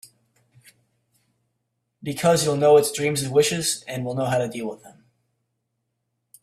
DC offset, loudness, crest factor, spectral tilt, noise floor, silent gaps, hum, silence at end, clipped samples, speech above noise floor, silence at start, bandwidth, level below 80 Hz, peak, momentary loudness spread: under 0.1%; -21 LUFS; 18 dB; -4 dB/octave; -77 dBFS; none; none; 1.55 s; under 0.1%; 56 dB; 2.05 s; 15 kHz; -62 dBFS; -6 dBFS; 16 LU